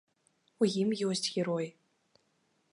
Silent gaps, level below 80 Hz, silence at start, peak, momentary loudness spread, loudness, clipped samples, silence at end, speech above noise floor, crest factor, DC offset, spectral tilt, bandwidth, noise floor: none; -82 dBFS; 0.6 s; -16 dBFS; 6 LU; -32 LUFS; under 0.1%; 1 s; 44 dB; 20 dB; under 0.1%; -5 dB/octave; 11.5 kHz; -75 dBFS